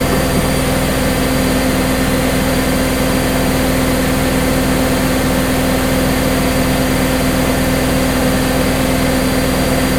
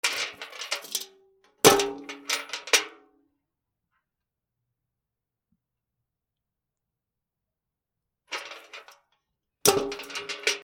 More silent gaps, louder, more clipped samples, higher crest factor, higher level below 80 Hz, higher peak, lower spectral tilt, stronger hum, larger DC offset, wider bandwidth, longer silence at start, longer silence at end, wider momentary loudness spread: neither; first, -14 LUFS vs -25 LUFS; neither; second, 14 dB vs 30 dB; first, -24 dBFS vs -66 dBFS; about the same, 0 dBFS vs 0 dBFS; first, -4.5 dB/octave vs -1.5 dB/octave; first, 50 Hz at -30 dBFS vs none; neither; second, 16.5 kHz vs 19.5 kHz; about the same, 0 s vs 0.05 s; about the same, 0 s vs 0 s; second, 0 LU vs 22 LU